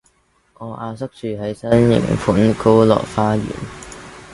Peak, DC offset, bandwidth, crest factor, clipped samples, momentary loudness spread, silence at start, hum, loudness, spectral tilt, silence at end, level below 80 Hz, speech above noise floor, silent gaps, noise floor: 0 dBFS; under 0.1%; 11.5 kHz; 18 dB; under 0.1%; 20 LU; 0.6 s; none; -17 LUFS; -7.5 dB/octave; 0 s; -42 dBFS; 43 dB; none; -59 dBFS